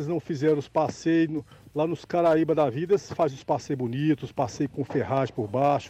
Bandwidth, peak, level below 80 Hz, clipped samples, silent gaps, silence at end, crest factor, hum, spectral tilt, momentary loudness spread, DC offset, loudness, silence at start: 8.6 kHz; -14 dBFS; -60 dBFS; under 0.1%; none; 0 s; 12 dB; none; -7 dB/octave; 7 LU; under 0.1%; -26 LUFS; 0 s